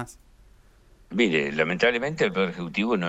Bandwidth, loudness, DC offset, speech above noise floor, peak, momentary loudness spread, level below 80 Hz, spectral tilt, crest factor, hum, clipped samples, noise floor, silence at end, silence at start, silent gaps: 11 kHz; -24 LUFS; under 0.1%; 30 dB; -8 dBFS; 6 LU; -56 dBFS; -5.5 dB/octave; 18 dB; none; under 0.1%; -55 dBFS; 0 s; 0 s; none